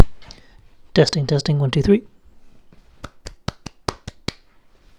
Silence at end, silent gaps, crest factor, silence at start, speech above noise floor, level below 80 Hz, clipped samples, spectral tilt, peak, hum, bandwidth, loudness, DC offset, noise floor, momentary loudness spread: 0.9 s; none; 20 dB; 0 s; 36 dB; -40 dBFS; under 0.1%; -6 dB/octave; 0 dBFS; none; 11 kHz; -21 LUFS; under 0.1%; -53 dBFS; 22 LU